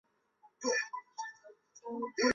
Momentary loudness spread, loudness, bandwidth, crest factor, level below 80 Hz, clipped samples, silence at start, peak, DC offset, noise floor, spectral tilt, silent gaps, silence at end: 20 LU; -37 LUFS; 7.6 kHz; 22 dB; -72 dBFS; under 0.1%; 0.45 s; -16 dBFS; under 0.1%; -68 dBFS; -0.5 dB/octave; none; 0 s